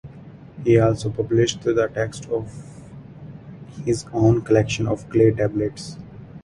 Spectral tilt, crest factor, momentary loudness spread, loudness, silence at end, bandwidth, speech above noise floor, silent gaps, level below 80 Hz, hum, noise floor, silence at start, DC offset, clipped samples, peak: -6.5 dB/octave; 20 dB; 23 LU; -21 LUFS; 0.05 s; 11.5 kHz; 22 dB; none; -46 dBFS; none; -42 dBFS; 0.05 s; under 0.1%; under 0.1%; -2 dBFS